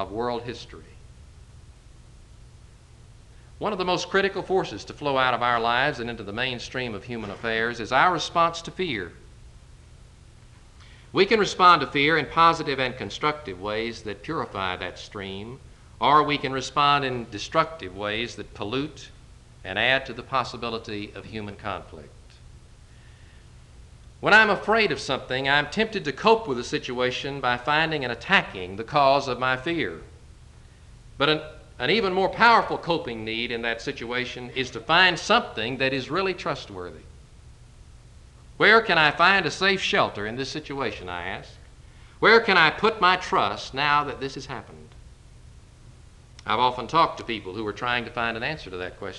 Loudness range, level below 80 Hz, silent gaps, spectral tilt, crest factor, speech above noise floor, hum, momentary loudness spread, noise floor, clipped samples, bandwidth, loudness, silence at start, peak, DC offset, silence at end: 8 LU; -50 dBFS; none; -4 dB/octave; 22 dB; 25 dB; none; 16 LU; -49 dBFS; under 0.1%; 11 kHz; -23 LUFS; 0 s; -2 dBFS; under 0.1%; 0 s